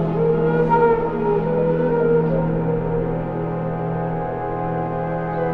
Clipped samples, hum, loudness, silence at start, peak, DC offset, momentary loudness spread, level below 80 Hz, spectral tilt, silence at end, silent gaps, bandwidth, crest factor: under 0.1%; none; -20 LUFS; 0 s; -4 dBFS; under 0.1%; 7 LU; -38 dBFS; -11 dB/octave; 0 s; none; 4.3 kHz; 14 dB